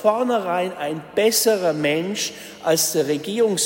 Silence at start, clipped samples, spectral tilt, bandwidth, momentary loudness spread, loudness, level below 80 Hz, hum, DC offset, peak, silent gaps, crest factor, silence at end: 0 s; under 0.1%; -3 dB/octave; 16.5 kHz; 8 LU; -21 LUFS; -66 dBFS; none; under 0.1%; -4 dBFS; none; 16 dB; 0 s